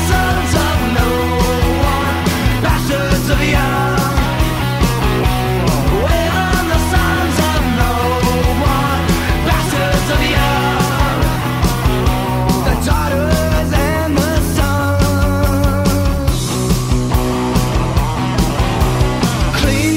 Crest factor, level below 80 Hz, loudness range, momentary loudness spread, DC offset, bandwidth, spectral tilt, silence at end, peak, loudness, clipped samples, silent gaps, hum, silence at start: 12 dB; -20 dBFS; 1 LU; 2 LU; under 0.1%; 16.5 kHz; -5.5 dB/octave; 0 s; 0 dBFS; -15 LUFS; under 0.1%; none; none; 0 s